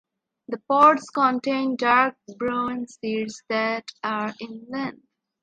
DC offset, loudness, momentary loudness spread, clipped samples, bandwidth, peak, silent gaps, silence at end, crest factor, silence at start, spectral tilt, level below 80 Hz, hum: under 0.1%; -23 LUFS; 15 LU; under 0.1%; 9.6 kHz; -4 dBFS; none; 0.5 s; 20 dB; 0.5 s; -4.5 dB/octave; -66 dBFS; none